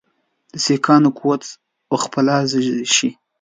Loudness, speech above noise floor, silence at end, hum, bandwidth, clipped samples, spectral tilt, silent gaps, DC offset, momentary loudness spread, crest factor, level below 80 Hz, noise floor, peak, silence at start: -17 LUFS; 47 dB; 0.3 s; none; 9.6 kHz; under 0.1%; -4 dB/octave; none; under 0.1%; 11 LU; 18 dB; -64 dBFS; -64 dBFS; 0 dBFS; 0.55 s